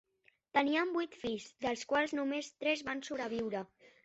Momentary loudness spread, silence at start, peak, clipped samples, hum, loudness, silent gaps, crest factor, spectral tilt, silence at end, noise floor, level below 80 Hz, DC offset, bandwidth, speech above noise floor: 8 LU; 0.55 s; -16 dBFS; under 0.1%; none; -36 LUFS; none; 20 dB; -2 dB/octave; 0.4 s; -73 dBFS; -72 dBFS; under 0.1%; 8 kHz; 38 dB